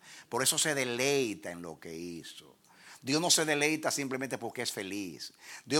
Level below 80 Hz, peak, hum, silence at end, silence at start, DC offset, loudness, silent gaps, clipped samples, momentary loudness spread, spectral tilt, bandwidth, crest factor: -78 dBFS; -10 dBFS; none; 0 s; 0.05 s; under 0.1%; -30 LUFS; none; under 0.1%; 18 LU; -2 dB/octave; 18.5 kHz; 22 dB